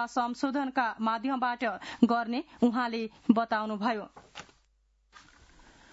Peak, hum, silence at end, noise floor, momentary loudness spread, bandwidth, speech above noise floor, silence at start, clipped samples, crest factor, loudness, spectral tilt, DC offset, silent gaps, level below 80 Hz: -8 dBFS; none; 0.75 s; -69 dBFS; 10 LU; 7.6 kHz; 40 dB; 0 s; under 0.1%; 22 dB; -30 LUFS; -3.5 dB/octave; under 0.1%; none; -68 dBFS